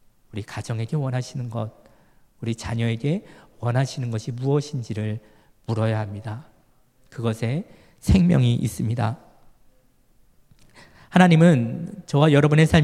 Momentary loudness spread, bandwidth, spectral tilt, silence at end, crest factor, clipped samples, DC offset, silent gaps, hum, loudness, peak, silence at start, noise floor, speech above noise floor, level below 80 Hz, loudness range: 18 LU; 13 kHz; -7 dB/octave; 0 s; 22 dB; under 0.1%; under 0.1%; none; none; -22 LUFS; 0 dBFS; 0.35 s; -58 dBFS; 37 dB; -44 dBFS; 7 LU